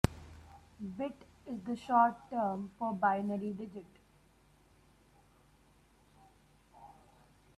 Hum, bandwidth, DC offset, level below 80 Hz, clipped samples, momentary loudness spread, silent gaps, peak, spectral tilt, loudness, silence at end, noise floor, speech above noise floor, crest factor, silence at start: none; 14.5 kHz; under 0.1%; -56 dBFS; under 0.1%; 28 LU; none; -6 dBFS; -7 dB/octave; -35 LUFS; 0.7 s; -66 dBFS; 31 dB; 32 dB; 0.05 s